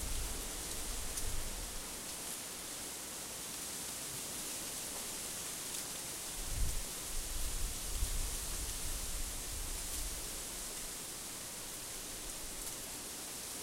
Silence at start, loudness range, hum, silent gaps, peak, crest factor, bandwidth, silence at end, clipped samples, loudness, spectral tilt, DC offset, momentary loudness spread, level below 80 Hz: 0 s; 2 LU; none; none; -22 dBFS; 18 dB; 16 kHz; 0 s; under 0.1%; -40 LUFS; -1.5 dB/octave; under 0.1%; 3 LU; -46 dBFS